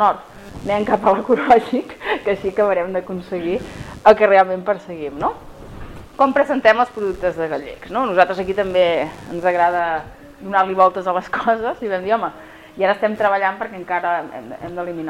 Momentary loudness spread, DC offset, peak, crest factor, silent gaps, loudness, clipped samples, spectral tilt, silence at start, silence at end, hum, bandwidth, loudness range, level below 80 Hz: 16 LU; under 0.1%; 0 dBFS; 18 dB; none; -18 LUFS; under 0.1%; -6 dB/octave; 0 s; 0 s; none; 13.5 kHz; 3 LU; -46 dBFS